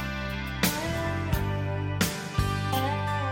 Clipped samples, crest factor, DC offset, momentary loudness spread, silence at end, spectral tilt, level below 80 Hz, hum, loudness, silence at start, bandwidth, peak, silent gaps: under 0.1%; 18 dB; under 0.1%; 4 LU; 0 s; -4.5 dB/octave; -40 dBFS; none; -29 LUFS; 0 s; 17 kHz; -10 dBFS; none